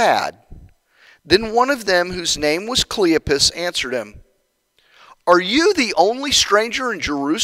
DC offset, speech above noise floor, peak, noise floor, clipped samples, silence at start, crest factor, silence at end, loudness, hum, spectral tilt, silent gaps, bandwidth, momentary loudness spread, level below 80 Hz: under 0.1%; 48 dB; 0 dBFS; -65 dBFS; under 0.1%; 0 s; 18 dB; 0 s; -17 LUFS; none; -2.5 dB/octave; none; 16 kHz; 7 LU; -44 dBFS